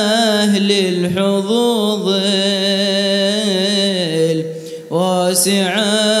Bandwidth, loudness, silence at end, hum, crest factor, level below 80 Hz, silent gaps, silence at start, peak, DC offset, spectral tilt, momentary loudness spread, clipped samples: 15.5 kHz; -15 LUFS; 0 s; none; 14 dB; -64 dBFS; none; 0 s; -2 dBFS; under 0.1%; -4 dB/octave; 4 LU; under 0.1%